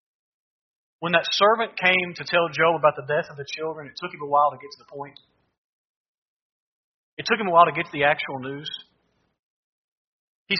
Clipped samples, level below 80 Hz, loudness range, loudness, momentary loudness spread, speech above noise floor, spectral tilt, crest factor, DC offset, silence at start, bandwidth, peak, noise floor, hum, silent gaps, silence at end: under 0.1%; -70 dBFS; 8 LU; -22 LUFS; 20 LU; 46 dB; -1.5 dB/octave; 22 dB; under 0.1%; 1 s; 6.4 kHz; -2 dBFS; -69 dBFS; none; 5.58-7.17 s, 9.39-10.46 s; 0 s